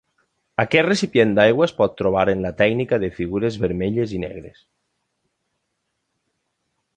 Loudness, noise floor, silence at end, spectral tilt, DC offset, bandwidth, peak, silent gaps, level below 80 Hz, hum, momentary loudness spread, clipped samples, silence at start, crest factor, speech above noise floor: -19 LUFS; -75 dBFS; 2.45 s; -6 dB/octave; under 0.1%; 9.8 kHz; -2 dBFS; none; -48 dBFS; none; 10 LU; under 0.1%; 0.6 s; 20 dB; 56 dB